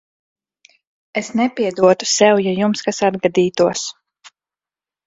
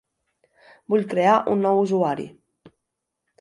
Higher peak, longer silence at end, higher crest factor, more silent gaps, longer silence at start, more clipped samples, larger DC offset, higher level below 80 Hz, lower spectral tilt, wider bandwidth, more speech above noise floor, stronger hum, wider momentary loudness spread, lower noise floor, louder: first, 0 dBFS vs -6 dBFS; first, 1.15 s vs 0.75 s; about the same, 18 dB vs 18 dB; neither; first, 1.15 s vs 0.9 s; neither; neither; first, -60 dBFS vs -72 dBFS; second, -4 dB/octave vs -7 dB/octave; second, 8 kHz vs 11 kHz; first, over 74 dB vs 61 dB; neither; first, 12 LU vs 9 LU; first, under -90 dBFS vs -81 dBFS; first, -17 LUFS vs -21 LUFS